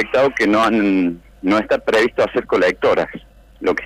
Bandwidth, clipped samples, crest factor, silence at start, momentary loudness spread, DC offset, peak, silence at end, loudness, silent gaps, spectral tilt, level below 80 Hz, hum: 15 kHz; under 0.1%; 10 dB; 0 s; 8 LU; under 0.1%; -8 dBFS; 0 s; -17 LUFS; none; -5.5 dB/octave; -46 dBFS; none